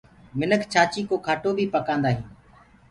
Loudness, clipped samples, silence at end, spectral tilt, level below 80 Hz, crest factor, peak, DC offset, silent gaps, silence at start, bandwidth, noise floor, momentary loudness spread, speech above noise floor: -24 LUFS; under 0.1%; 0.6 s; -5.5 dB/octave; -54 dBFS; 20 dB; -6 dBFS; under 0.1%; none; 0.35 s; 11.5 kHz; -53 dBFS; 9 LU; 30 dB